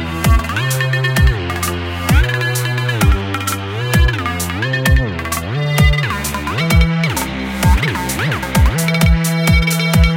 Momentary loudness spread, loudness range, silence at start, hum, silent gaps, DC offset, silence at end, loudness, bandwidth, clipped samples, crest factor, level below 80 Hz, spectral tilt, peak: 6 LU; 2 LU; 0 s; none; none; under 0.1%; 0 s; -15 LUFS; 17 kHz; under 0.1%; 14 dB; -20 dBFS; -5 dB/octave; 0 dBFS